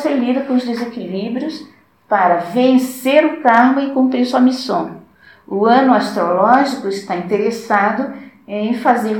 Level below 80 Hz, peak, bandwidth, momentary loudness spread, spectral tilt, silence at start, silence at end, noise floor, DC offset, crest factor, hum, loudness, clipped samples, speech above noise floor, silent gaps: -66 dBFS; 0 dBFS; 18 kHz; 12 LU; -5.5 dB/octave; 0 s; 0 s; -44 dBFS; under 0.1%; 16 dB; none; -15 LUFS; under 0.1%; 29 dB; none